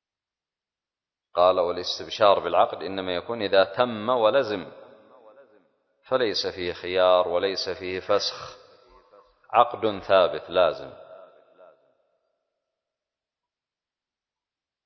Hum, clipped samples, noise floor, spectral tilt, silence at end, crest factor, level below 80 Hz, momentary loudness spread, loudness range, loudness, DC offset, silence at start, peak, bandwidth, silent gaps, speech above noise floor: none; under 0.1%; under -90 dBFS; -4 dB/octave; 3.6 s; 24 dB; -60 dBFS; 11 LU; 4 LU; -24 LUFS; under 0.1%; 1.35 s; -4 dBFS; 6.4 kHz; none; over 67 dB